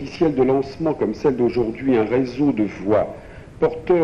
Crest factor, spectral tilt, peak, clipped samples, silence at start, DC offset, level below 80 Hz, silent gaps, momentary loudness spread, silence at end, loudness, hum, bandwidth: 14 dB; -8.5 dB/octave; -6 dBFS; under 0.1%; 0 s; under 0.1%; -44 dBFS; none; 5 LU; 0 s; -20 LUFS; none; 7.4 kHz